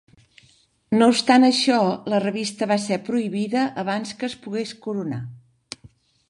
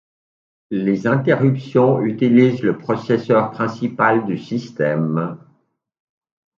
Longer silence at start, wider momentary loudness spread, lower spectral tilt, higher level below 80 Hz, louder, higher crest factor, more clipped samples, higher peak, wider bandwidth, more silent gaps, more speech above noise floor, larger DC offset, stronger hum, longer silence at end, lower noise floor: first, 0.9 s vs 0.7 s; first, 17 LU vs 9 LU; second, -4.5 dB/octave vs -8.5 dB/octave; about the same, -66 dBFS vs -62 dBFS; second, -21 LUFS vs -18 LUFS; about the same, 20 dB vs 18 dB; neither; about the same, -2 dBFS vs 0 dBFS; first, 11.5 kHz vs 7.2 kHz; neither; second, 38 dB vs 46 dB; neither; neither; second, 0.45 s vs 1.2 s; second, -59 dBFS vs -63 dBFS